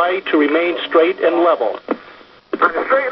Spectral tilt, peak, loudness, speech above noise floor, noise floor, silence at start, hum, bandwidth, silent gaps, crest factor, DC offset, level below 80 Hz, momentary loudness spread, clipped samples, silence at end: -6.5 dB/octave; -2 dBFS; -16 LUFS; 27 dB; -42 dBFS; 0 s; none; 5.8 kHz; none; 14 dB; under 0.1%; -62 dBFS; 11 LU; under 0.1%; 0 s